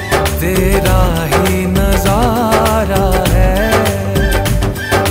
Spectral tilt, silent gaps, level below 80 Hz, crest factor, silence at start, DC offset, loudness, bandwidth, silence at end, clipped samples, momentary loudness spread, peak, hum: -5 dB/octave; none; -18 dBFS; 12 dB; 0 s; under 0.1%; -13 LUFS; 16.5 kHz; 0 s; under 0.1%; 3 LU; 0 dBFS; none